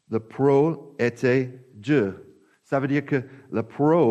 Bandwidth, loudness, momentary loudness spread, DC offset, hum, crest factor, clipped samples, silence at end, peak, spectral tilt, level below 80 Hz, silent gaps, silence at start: 8.6 kHz; -24 LUFS; 11 LU; under 0.1%; none; 14 dB; under 0.1%; 0 s; -8 dBFS; -8 dB/octave; -68 dBFS; none; 0.1 s